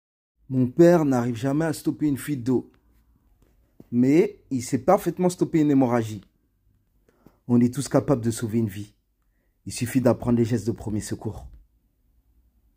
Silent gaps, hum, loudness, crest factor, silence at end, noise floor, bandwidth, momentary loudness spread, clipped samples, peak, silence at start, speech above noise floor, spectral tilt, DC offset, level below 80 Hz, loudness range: none; none; -23 LUFS; 20 dB; 1.2 s; -68 dBFS; 16 kHz; 13 LU; under 0.1%; -4 dBFS; 0.5 s; 46 dB; -7 dB/octave; under 0.1%; -54 dBFS; 4 LU